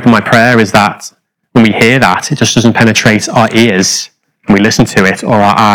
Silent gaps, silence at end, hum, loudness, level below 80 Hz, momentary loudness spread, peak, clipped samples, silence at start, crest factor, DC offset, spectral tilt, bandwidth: none; 0 s; none; -8 LUFS; -40 dBFS; 7 LU; 0 dBFS; 6%; 0 s; 8 dB; under 0.1%; -4.5 dB/octave; 19.5 kHz